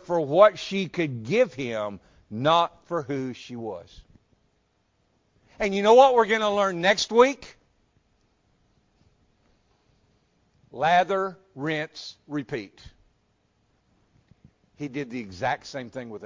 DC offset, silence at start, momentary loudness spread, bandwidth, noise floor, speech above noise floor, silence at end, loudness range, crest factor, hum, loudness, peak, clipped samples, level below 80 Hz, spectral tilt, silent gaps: under 0.1%; 0.1 s; 18 LU; 7.6 kHz; -70 dBFS; 46 dB; 0 s; 14 LU; 22 dB; none; -24 LUFS; -4 dBFS; under 0.1%; -62 dBFS; -4.5 dB/octave; none